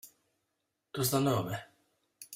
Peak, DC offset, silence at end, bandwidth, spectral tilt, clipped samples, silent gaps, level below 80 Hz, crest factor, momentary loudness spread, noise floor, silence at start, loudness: -16 dBFS; under 0.1%; 0 s; 16 kHz; -5 dB/octave; under 0.1%; none; -68 dBFS; 20 dB; 15 LU; -83 dBFS; 0.05 s; -32 LUFS